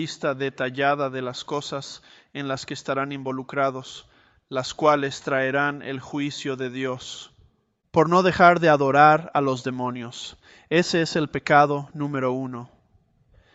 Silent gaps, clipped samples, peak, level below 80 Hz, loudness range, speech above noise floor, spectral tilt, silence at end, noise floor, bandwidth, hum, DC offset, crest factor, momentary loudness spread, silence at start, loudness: none; under 0.1%; -2 dBFS; -60 dBFS; 8 LU; 40 dB; -5.5 dB/octave; 0.9 s; -63 dBFS; 8.2 kHz; none; under 0.1%; 22 dB; 18 LU; 0 s; -23 LUFS